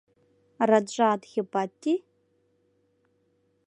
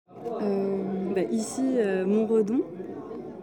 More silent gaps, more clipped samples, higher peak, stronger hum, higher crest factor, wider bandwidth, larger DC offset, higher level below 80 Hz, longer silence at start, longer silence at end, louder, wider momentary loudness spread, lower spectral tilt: neither; neither; first, -8 dBFS vs -12 dBFS; neither; first, 22 dB vs 14 dB; second, 10.5 kHz vs 17.5 kHz; neither; second, -80 dBFS vs -68 dBFS; first, 0.6 s vs 0.1 s; first, 1.7 s vs 0 s; about the same, -26 LUFS vs -27 LUFS; second, 7 LU vs 14 LU; second, -5 dB/octave vs -6.5 dB/octave